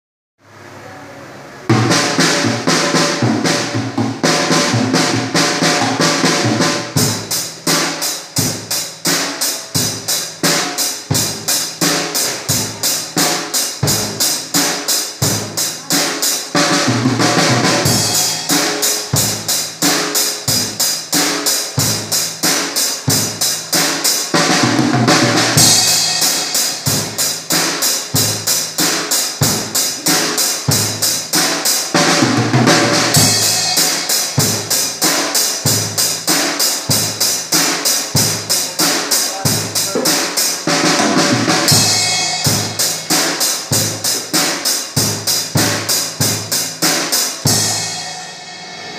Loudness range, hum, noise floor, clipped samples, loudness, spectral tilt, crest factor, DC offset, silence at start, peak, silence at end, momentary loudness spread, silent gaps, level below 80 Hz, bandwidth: 4 LU; none; -36 dBFS; under 0.1%; -13 LUFS; -2.5 dB/octave; 16 dB; under 0.1%; 0.55 s; 0 dBFS; 0 s; 5 LU; none; -52 dBFS; 16 kHz